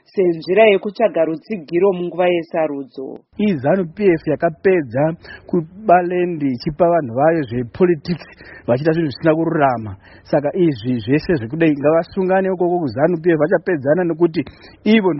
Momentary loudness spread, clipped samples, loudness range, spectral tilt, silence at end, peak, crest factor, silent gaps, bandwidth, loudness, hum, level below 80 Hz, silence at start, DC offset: 9 LU; under 0.1%; 2 LU; -6 dB/octave; 0 s; 0 dBFS; 16 dB; none; 5.8 kHz; -17 LUFS; none; -50 dBFS; 0.15 s; under 0.1%